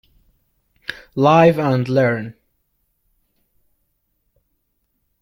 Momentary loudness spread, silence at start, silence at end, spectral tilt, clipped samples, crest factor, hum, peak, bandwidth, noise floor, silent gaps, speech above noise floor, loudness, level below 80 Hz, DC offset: 20 LU; 0.9 s; 2.9 s; -7.5 dB/octave; under 0.1%; 20 dB; none; -2 dBFS; 16 kHz; -70 dBFS; none; 55 dB; -16 LUFS; -58 dBFS; under 0.1%